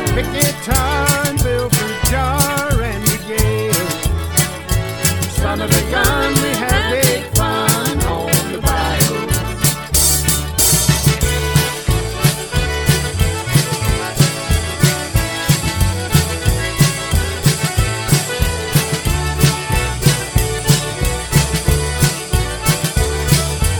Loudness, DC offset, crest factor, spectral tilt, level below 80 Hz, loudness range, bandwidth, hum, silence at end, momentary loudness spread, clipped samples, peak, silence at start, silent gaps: -16 LUFS; under 0.1%; 16 dB; -4 dB/octave; -24 dBFS; 2 LU; 19 kHz; none; 0 s; 5 LU; under 0.1%; 0 dBFS; 0 s; none